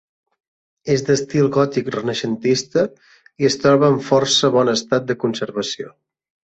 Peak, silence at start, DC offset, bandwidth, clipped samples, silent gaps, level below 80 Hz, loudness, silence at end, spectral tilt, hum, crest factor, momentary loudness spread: -2 dBFS; 0.85 s; under 0.1%; 8.2 kHz; under 0.1%; none; -58 dBFS; -18 LUFS; 0.7 s; -4.5 dB/octave; none; 16 dB; 10 LU